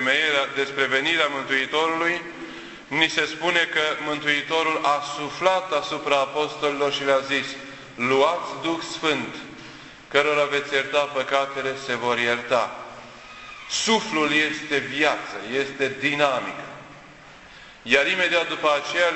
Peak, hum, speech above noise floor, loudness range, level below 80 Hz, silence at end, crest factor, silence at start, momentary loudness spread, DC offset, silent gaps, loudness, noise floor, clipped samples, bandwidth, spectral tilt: -2 dBFS; none; 23 dB; 2 LU; -62 dBFS; 0 s; 22 dB; 0 s; 17 LU; under 0.1%; none; -22 LUFS; -46 dBFS; under 0.1%; 8.4 kHz; -2.5 dB/octave